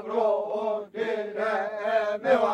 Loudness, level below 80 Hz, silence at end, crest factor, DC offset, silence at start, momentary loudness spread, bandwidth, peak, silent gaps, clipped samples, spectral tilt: -27 LUFS; -72 dBFS; 0 s; 18 dB; under 0.1%; 0 s; 6 LU; 9.4 kHz; -10 dBFS; none; under 0.1%; -5 dB/octave